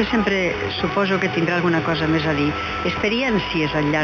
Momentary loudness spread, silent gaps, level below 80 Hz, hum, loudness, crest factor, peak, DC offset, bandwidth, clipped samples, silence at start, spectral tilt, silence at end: 3 LU; none; -40 dBFS; 50 Hz at -40 dBFS; -20 LUFS; 14 dB; -6 dBFS; under 0.1%; 7.2 kHz; under 0.1%; 0 s; -6 dB/octave; 0 s